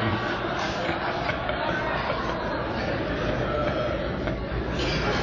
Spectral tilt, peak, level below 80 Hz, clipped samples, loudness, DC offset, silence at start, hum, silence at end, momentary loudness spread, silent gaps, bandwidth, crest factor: -6 dB/octave; -10 dBFS; -38 dBFS; under 0.1%; -27 LUFS; under 0.1%; 0 s; none; 0 s; 3 LU; none; 7.6 kHz; 16 dB